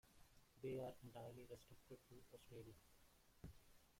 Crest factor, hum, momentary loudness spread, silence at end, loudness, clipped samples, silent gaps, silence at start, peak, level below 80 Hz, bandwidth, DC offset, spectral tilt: 18 dB; none; 14 LU; 0 s; -58 LUFS; under 0.1%; none; 0.05 s; -42 dBFS; -74 dBFS; 16.5 kHz; under 0.1%; -6 dB/octave